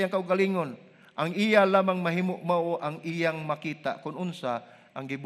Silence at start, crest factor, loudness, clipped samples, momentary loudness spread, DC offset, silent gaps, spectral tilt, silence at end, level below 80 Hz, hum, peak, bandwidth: 0 s; 20 dB; -28 LUFS; under 0.1%; 14 LU; under 0.1%; none; -6.5 dB/octave; 0 s; -78 dBFS; none; -6 dBFS; 13.5 kHz